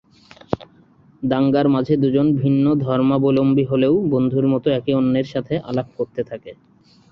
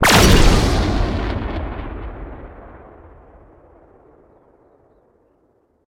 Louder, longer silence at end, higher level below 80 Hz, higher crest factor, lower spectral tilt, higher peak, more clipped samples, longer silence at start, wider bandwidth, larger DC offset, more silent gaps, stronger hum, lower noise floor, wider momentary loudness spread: about the same, -19 LUFS vs -17 LUFS; second, 0.6 s vs 3.1 s; second, -52 dBFS vs -24 dBFS; about the same, 16 dB vs 18 dB; first, -10 dB/octave vs -4.5 dB/octave; about the same, -2 dBFS vs 0 dBFS; neither; first, 0.5 s vs 0 s; second, 5.8 kHz vs 18.5 kHz; neither; neither; neither; second, -52 dBFS vs -60 dBFS; second, 12 LU vs 27 LU